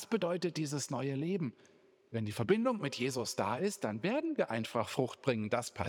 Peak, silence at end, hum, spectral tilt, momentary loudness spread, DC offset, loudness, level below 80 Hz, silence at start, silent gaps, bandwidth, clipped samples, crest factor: -16 dBFS; 0 s; none; -5 dB/octave; 5 LU; under 0.1%; -35 LUFS; -78 dBFS; 0 s; none; 19.5 kHz; under 0.1%; 18 dB